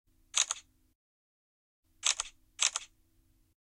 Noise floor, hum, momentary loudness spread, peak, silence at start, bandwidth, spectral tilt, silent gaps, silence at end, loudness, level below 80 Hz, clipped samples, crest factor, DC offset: -69 dBFS; none; 10 LU; -10 dBFS; 0.35 s; 16 kHz; 4 dB/octave; 0.95-1.83 s; 0.85 s; -32 LUFS; -70 dBFS; under 0.1%; 28 dB; under 0.1%